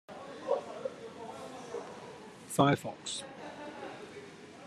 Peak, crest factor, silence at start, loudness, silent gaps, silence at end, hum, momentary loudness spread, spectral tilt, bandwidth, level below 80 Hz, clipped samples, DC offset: -12 dBFS; 26 dB; 0.1 s; -36 LUFS; none; 0 s; none; 19 LU; -5 dB/octave; 13 kHz; -74 dBFS; under 0.1%; under 0.1%